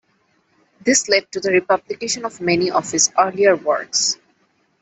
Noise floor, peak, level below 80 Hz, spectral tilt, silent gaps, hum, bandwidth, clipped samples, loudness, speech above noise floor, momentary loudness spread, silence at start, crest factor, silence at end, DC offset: -63 dBFS; -2 dBFS; -62 dBFS; -2 dB/octave; none; none; 8.4 kHz; under 0.1%; -18 LUFS; 45 dB; 8 LU; 0.85 s; 18 dB; 0.65 s; under 0.1%